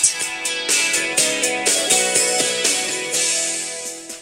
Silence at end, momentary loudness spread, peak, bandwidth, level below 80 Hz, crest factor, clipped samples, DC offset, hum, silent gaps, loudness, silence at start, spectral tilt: 0 s; 7 LU; -2 dBFS; 16 kHz; -66 dBFS; 18 dB; under 0.1%; under 0.1%; none; none; -17 LUFS; 0 s; 0.5 dB/octave